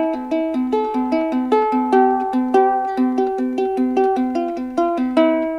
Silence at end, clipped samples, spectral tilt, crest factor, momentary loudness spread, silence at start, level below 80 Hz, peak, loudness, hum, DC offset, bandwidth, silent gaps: 0 s; under 0.1%; -6 dB/octave; 16 dB; 5 LU; 0 s; -54 dBFS; -2 dBFS; -18 LUFS; none; under 0.1%; 7.2 kHz; none